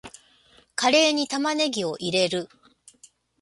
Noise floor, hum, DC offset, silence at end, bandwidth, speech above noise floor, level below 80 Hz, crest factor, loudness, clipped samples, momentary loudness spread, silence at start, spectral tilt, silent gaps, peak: -58 dBFS; none; under 0.1%; 0.95 s; 11.5 kHz; 35 dB; -68 dBFS; 20 dB; -23 LUFS; under 0.1%; 13 LU; 0.05 s; -3 dB/octave; none; -6 dBFS